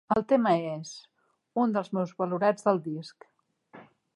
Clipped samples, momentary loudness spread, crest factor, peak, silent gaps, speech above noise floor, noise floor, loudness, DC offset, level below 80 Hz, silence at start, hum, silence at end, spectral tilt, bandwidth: under 0.1%; 16 LU; 20 dB; -10 dBFS; none; 27 dB; -55 dBFS; -28 LUFS; under 0.1%; -68 dBFS; 0.1 s; none; 0.35 s; -6.5 dB/octave; 11.5 kHz